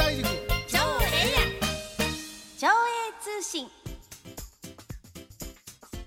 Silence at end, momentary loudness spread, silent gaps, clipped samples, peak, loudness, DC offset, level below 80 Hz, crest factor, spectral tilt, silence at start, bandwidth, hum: 0 s; 21 LU; none; under 0.1%; -8 dBFS; -27 LUFS; under 0.1%; -38 dBFS; 20 dB; -3 dB/octave; 0 s; 17 kHz; none